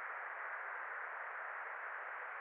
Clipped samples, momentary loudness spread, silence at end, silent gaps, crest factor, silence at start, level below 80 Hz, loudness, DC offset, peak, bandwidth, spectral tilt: under 0.1%; 1 LU; 0 s; none; 12 dB; 0 s; under -90 dBFS; -45 LUFS; under 0.1%; -34 dBFS; 4.2 kHz; 5.5 dB/octave